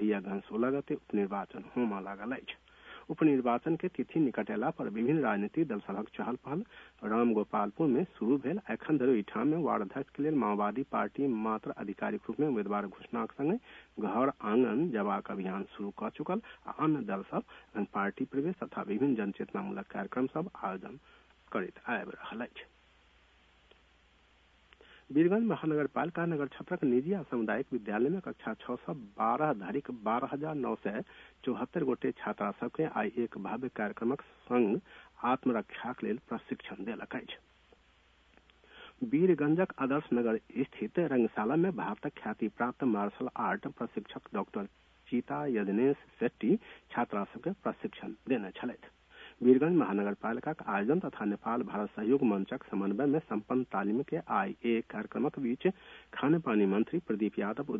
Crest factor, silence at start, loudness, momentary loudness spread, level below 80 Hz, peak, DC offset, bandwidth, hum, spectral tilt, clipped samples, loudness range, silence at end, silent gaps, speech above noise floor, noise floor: 22 dB; 0 s; -33 LUFS; 11 LU; -70 dBFS; -12 dBFS; under 0.1%; 3.8 kHz; none; -9.5 dB/octave; under 0.1%; 5 LU; 0 s; none; 33 dB; -66 dBFS